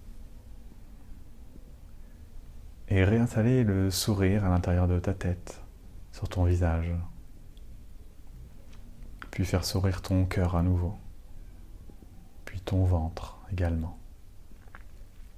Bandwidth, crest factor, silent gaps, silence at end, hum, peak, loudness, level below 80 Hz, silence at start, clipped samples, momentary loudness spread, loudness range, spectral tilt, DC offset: 15.5 kHz; 16 dB; none; 0.1 s; none; -14 dBFS; -28 LUFS; -42 dBFS; 0 s; under 0.1%; 26 LU; 7 LU; -6.5 dB/octave; under 0.1%